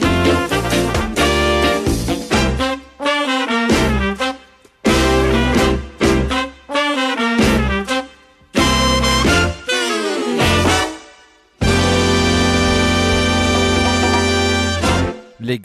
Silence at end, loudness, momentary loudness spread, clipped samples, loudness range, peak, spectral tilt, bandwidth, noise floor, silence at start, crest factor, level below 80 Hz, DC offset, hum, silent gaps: 0 s; -16 LUFS; 7 LU; under 0.1%; 2 LU; -4 dBFS; -4.5 dB/octave; 14 kHz; -47 dBFS; 0 s; 12 dB; -26 dBFS; under 0.1%; none; none